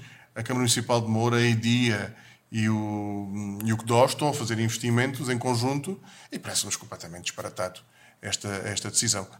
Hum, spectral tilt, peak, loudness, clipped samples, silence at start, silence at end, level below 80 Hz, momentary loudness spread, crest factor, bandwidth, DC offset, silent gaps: none; -4 dB/octave; -8 dBFS; -26 LUFS; under 0.1%; 0 s; 0 s; -66 dBFS; 13 LU; 20 dB; 16.5 kHz; under 0.1%; none